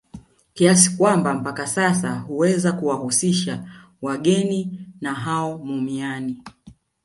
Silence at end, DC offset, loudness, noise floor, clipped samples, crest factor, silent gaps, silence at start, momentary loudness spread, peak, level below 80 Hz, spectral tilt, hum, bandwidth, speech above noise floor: 0.3 s; under 0.1%; -20 LUFS; -49 dBFS; under 0.1%; 20 dB; none; 0.15 s; 14 LU; 0 dBFS; -60 dBFS; -4.5 dB/octave; none; 11.5 kHz; 29 dB